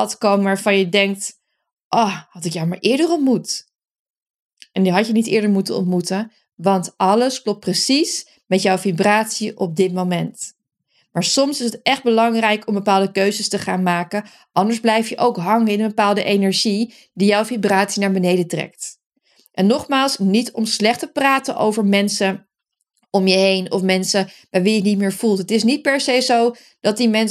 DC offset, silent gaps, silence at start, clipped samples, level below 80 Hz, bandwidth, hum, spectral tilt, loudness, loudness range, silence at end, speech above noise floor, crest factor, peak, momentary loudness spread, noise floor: under 0.1%; 1.73-1.77 s, 1.84-1.91 s, 3.75-3.79 s, 3.99-4.14 s, 4.30-4.49 s, 19.06-19.10 s; 0 s; under 0.1%; -68 dBFS; 14.5 kHz; none; -4.5 dB/octave; -18 LUFS; 2 LU; 0 s; 59 dB; 18 dB; 0 dBFS; 8 LU; -76 dBFS